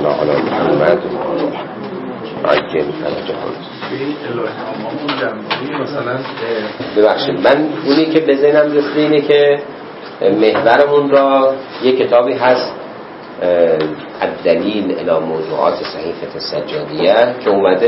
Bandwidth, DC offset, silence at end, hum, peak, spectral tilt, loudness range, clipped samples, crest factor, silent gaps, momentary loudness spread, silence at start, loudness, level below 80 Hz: 5.8 kHz; under 0.1%; 0 s; none; 0 dBFS; -8 dB/octave; 8 LU; under 0.1%; 14 dB; none; 13 LU; 0 s; -15 LUFS; -56 dBFS